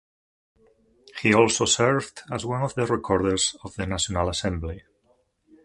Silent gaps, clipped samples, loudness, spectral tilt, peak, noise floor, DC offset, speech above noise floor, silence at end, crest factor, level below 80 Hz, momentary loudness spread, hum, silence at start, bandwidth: none; under 0.1%; -24 LUFS; -3.5 dB/octave; -2 dBFS; -66 dBFS; under 0.1%; 42 dB; 0.85 s; 22 dB; -44 dBFS; 14 LU; none; 1.15 s; 11.5 kHz